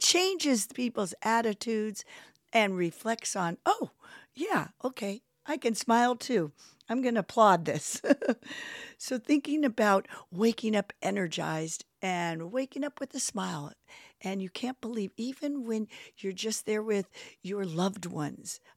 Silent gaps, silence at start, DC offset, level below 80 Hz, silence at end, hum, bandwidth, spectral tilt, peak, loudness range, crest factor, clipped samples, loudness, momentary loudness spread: none; 0 s; under 0.1%; -80 dBFS; 0.2 s; none; 16.5 kHz; -3.5 dB/octave; -10 dBFS; 7 LU; 22 dB; under 0.1%; -31 LUFS; 13 LU